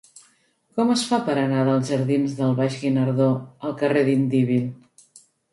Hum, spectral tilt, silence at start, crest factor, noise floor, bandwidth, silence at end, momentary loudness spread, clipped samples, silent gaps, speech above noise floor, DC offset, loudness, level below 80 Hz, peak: none; -6.5 dB/octave; 0.75 s; 14 dB; -63 dBFS; 11.5 kHz; 0.8 s; 5 LU; under 0.1%; none; 42 dB; under 0.1%; -22 LUFS; -66 dBFS; -8 dBFS